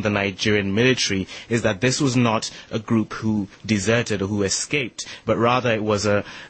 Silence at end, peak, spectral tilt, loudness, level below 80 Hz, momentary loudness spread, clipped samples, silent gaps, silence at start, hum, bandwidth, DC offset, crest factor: 0 s; -6 dBFS; -4.5 dB/octave; -21 LUFS; -52 dBFS; 7 LU; under 0.1%; none; 0 s; none; 8.8 kHz; under 0.1%; 16 dB